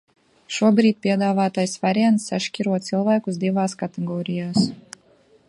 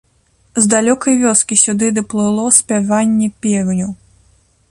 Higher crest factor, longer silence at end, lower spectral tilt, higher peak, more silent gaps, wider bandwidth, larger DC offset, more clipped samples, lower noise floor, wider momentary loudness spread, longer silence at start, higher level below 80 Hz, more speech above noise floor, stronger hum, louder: about the same, 18 dB vs 14 dB; about the same, 0.7 s vs 0.75 s; first, -5.5 dB/octave vs -4 dB/octave; second, -4 dBFS vs 0 dBFS; neither; about the same, 11.5 kHz vs 11.5 kHz; neither; neither; about the same, -56 dBFS vs -56 dBFS; about the same, 9 LU vs 7 LU; about the same, 0.5 s vs 0.55 s; second, -66 dBFS vs -52 dBFS; second, 36 dB vs 42 dB; neither; second, -21 LUFS vs -13 LUFS